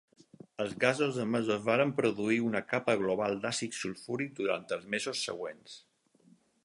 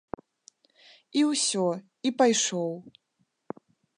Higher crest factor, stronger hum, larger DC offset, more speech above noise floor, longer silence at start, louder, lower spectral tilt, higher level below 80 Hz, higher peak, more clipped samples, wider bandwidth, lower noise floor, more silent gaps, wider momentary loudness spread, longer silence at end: about the same, 24 dB vs 20 dB; neither; neither; about the same, 33 dB vs 35 dB; second, 0.6 s vs 1.15 s; second, -32 LUFS vs -26 LUFS; first, -4.5 dB/octave vs -3 dB/octave; about the same, -74 dBFS vs -72 dBFS; about the same, -10 dBFS vs -8 dBFS; neither; about the same, 11.5 kHz vs 11 kHz; first, -65 dBFS vs -61 dBFS; neither; second, 11 LU vs 22 LU; second, 0.85 s vs 1.1 s